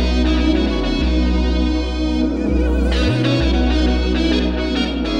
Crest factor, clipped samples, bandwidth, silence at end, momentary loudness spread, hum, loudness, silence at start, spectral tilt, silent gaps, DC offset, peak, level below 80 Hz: 12 dB; under 0.1%; 8.2 kHz; 0 s; 3 LU; none; -18 LUFS; 0 s; -6.5 dB/octave; none; under 0.1%; -4 dBFS; -20 dBFS